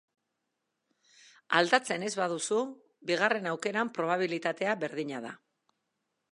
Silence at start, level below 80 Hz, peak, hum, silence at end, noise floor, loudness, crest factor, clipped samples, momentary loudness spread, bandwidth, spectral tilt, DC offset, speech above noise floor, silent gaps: 1.5 s; -86 dBFS; -6 dBFS; none; 1 s; -83 dBFS; -30 LUFS; 26 dB; under 0.1%; 13 LU; 11.5 kHz; -3.5 dB/octave; under 0.1%; 53 dB; none